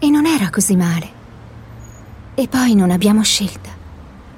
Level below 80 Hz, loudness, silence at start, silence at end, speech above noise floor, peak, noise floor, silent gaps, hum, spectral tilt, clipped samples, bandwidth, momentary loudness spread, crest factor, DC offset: -42 dBFS; -15 LUFS; 0 s; 0.1 s; 22 dB; -2 dBFS; -37 dBFS; none; none; -4.5 dB/octave; under 0.1%; 16.5 kHz; 22 LU; 16 dB; under 0.1%